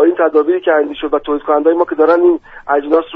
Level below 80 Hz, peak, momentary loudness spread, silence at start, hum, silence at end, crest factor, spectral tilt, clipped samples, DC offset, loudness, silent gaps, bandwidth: -48 dBFS; 0 dBFS; 7 LU; 0 s; none; 0 s; 12 dB; -7 dB/octave; under 0.1%; under 0.1%; -13 LUFS; none; 4.6 kHz